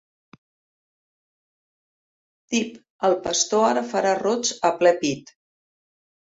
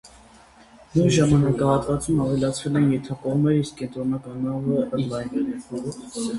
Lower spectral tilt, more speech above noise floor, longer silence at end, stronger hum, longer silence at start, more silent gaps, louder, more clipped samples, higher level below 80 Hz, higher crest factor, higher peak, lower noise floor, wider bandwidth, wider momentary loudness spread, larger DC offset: second, -2.5 dB/octave vs -6.5 dB/octave; first, over 69 dB vs 28 dB; first, 1.15 s vs 0 s; neither; first, 2.5 s vs 0.05 s; first, 2.90-2.99 s vs none; about the same, -22 LUFS vs -23 LUFS; neither; second, -66 dBFS vs -46 dBFS; about the same, 20 dB vs 16 dB; about the same, -4 dBFS vs -6 dBFS; first, under -90 dBFS vs -50 dBFS; second, 8 kHz vs 11.5 kHz; second, 7 LU vs 11 LU; neither